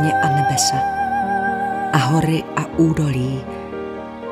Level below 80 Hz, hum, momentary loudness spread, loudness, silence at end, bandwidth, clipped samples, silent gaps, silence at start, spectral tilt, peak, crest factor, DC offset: -44 dBFS; none; 12 LU; -19 LUFS; 0 s; 15 kHz; under 0.1%; none; 0 s; -5 dB/octave; -2 dBFS; 18 dB; under 0.1%